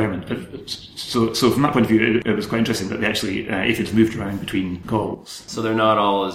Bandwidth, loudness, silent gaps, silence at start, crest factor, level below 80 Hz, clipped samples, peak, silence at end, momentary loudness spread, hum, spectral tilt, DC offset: 16 kHz; -20 LUFS; none; 0 s; 18 dB; -48 dBFS; under 0.1%; -2 dBFS; 0 s; 13 LU; none; -5.5 dB/octave; under 0.1%